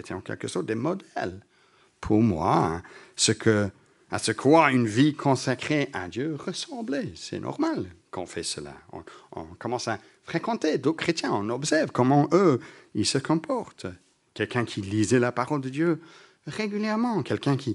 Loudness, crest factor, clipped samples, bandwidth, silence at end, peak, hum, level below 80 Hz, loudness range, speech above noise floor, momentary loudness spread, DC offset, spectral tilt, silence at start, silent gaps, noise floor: -26 LUFS; 22 dB; under 0.1%; 11.5 kHz; 0 s; -4 dBFS; none; -58 dBFS; 9 LU; 35 dB; 15 LU; under 0.1%; -5 dB/octave; 0.05 s; none; -61 dBFS